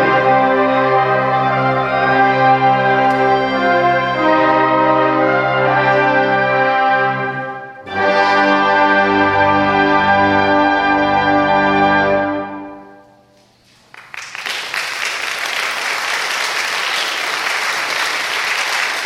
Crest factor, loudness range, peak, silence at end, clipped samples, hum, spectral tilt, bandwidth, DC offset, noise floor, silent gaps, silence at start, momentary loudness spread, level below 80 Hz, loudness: 14 dB; 7 LU; -2 dBFS; 0 s; under 0.1%; none; -4 dB/octave; 16 kHz; under 0.1%; -51 dBFS; none; 0 s; 8 LU; -48 dBFS; -14 LUFS